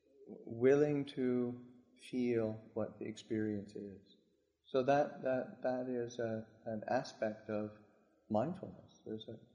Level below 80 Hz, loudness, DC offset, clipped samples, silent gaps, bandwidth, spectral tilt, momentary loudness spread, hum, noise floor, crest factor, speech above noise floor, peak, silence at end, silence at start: -76 dBFS; -38 LUFS; under 0.1%; under 0.1%; none; 10 kHz; -7 dB/octave; 17 LU; none; -76 dBFS; 20 dB; 39 dB; -18 dBFS; 0.15 s; 0.2 s